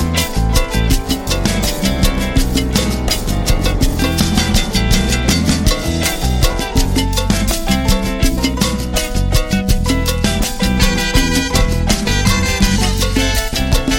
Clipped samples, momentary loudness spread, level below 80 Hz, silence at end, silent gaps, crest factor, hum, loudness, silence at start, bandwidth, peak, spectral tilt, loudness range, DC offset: under 0.1%; 3 LU; -18 dBFS; 0 s; none; 14 dB; none; -15 LUFS; 0 s; 17 kHz; 0 dBFS; -4 dB/octave; 2 LU; under 0.1%